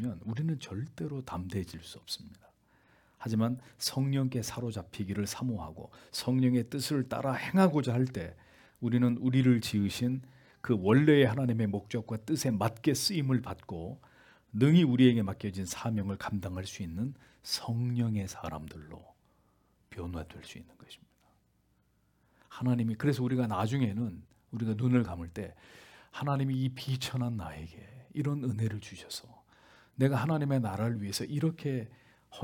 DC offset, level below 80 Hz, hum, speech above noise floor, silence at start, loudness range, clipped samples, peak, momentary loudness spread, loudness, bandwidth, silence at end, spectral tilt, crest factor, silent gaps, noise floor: under 0.1%; -64 dBFS; none; 40 dB; 0 s; 9 LU; under 0.1%; -10 dBFS; 17 LU; -31 LUFS; 18 kHz; 0 s; -6 dB/octave; 22 dB; none; -71 dBFS